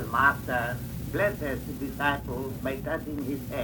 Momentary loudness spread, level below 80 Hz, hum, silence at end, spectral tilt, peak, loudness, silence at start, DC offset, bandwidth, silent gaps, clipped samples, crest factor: 10 LU; -44 dBFS; none; 0 s; -6 dB/octave; -8 dBFS; -29 LUFS; 0 s; under 0.1%; over 20 kHz; none; under 0.1%; 22 dB